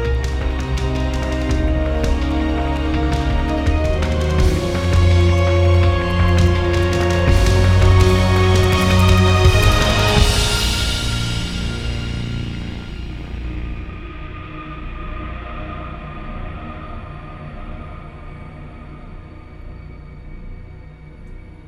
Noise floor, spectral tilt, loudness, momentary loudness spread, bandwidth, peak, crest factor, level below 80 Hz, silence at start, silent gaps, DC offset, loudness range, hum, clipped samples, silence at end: -37 dBFS; -5.5 dB/octave; -17 LUFS; 23 LU; 15 kHz; -2 dBFS; 16 dB; -22 dBFS; 0 s; none; under 0.1%; 21 LU; none; under 0.1%; 0.1 s